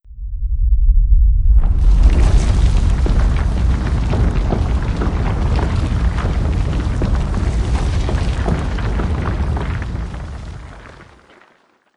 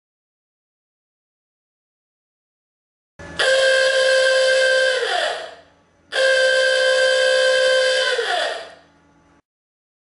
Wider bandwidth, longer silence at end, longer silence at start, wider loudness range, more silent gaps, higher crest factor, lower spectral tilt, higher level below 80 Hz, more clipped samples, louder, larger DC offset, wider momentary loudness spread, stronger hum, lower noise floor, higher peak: second, 10 kHz vs 11.5 kHz; second, 0.95 s vs 1.4 s; second, 0.1 s vs 3.2 s; about the same, 6 LU vs 4 LU; neither; about the same, 14 dB vs 14 dB; first, -7 dB/octave vs 0.5 dB/octave; first, -16 dBFS vs -62 dBFS; neither; about the same, -18 LUFS vs -17 LUFS; neither; about the same, 11 LU vs 10 LU; neither; about the same, -55 dBFS vs -55 dBFS; first, 0 dBFS vs -6 dBFS